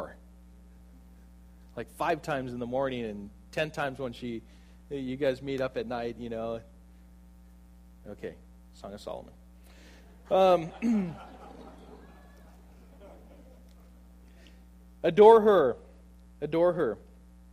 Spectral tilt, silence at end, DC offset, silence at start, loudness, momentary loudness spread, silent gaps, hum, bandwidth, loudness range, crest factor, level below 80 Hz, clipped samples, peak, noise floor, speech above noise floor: -6.5 dB/octave; 0.55 s; under 0.1%; 0 s; -27 LUFS; 21 LU; none; none; 13 kHz; 17 LU; 24 dB; -54 dBFS; under 0.1%; -6 dBFS; -53 dBFS; 26 dB